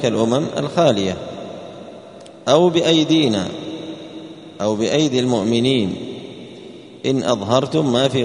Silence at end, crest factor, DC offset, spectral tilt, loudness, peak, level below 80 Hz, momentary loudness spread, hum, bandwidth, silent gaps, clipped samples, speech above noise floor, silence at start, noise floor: 0 s; 18 dB; under 0.1%; -5.5 dB/octave; -18 LUFS; 0 dBFS; -56 dBFS; 22 LU; none; 11 kHz; none; under 0.1%; 22 dB; 0 s; -39 dBFS